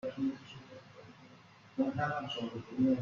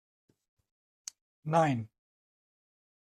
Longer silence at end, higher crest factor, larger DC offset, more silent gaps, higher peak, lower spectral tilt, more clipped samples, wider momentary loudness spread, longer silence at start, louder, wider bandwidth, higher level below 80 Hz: second, 0 s vs 1.35 s; second, 16 dB vs 24 dB; neither; neither; second, -20 dBFS vs -14 dBFS; about the same, -7 dB/octave vs -6 dB/octave; neither; first, 23 LU vs 19 LU; second, 0.05 s vs 1.45 s; second, -36 LUFS vs -30 LUFS; second, 7.2 kHz vs 13 kHz; about the same, -72 dBFS vs -76 dBFS